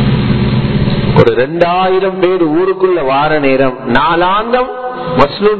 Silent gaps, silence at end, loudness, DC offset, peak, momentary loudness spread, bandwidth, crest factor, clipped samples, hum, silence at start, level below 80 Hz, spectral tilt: none; 0 s; -11 LUFS; under 0.1%; 0 dBFS; 3 LU; 6.2 kHz; 10 dB; 0.3%; none; 0 s; -30 dBFS; -9 dB/octave